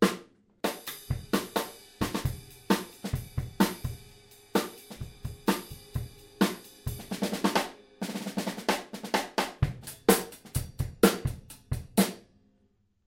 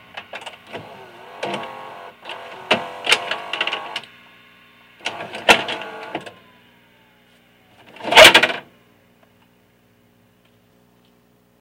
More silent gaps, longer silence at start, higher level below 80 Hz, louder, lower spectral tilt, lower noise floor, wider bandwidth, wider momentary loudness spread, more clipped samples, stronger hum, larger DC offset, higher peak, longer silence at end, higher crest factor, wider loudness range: neither; second, 0 s vs 0.15 s; first, -48 dBFS vs -54 dBFS; second, -31 LUFS vs -15 LUFS; first, -4.5 dB/octave vs -1 dB/octave; first, -69 dBFS vs -57 dBFS; about the same, 16.5 kHz vs 16.5 kHz; second, 15 LU vs 27 LU; second, under 0.1% vs 0.1%; second, none vs 60 Hz at -55 dBFS; neither; second, -4 dBFS vs 0 dBFS; second, 0.85 s vs 3 s; about the same, 26 dB vs 22 dB; second, 4 LU vs 8 LU